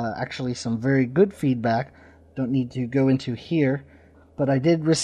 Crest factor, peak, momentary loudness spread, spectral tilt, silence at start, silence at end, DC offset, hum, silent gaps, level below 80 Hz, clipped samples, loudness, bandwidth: 16 dB; -6 dBFS; 10 LU; -6.5 dB/octave; 0 s; 0 s; under 0.1%; none; none; -56 dBFS; under 0.1%; -23 LUFS; 11 kHz